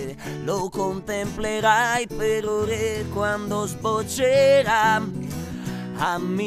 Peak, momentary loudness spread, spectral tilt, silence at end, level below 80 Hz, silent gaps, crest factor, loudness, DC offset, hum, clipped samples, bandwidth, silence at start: -6 dBFS; 14 LU; -4.5 dB/octave; 0 s; -46 dBFS; none; 16 dB; -23 LUFS; under 0.1%; none; under 0.1%; 15.5 kHz; 0 s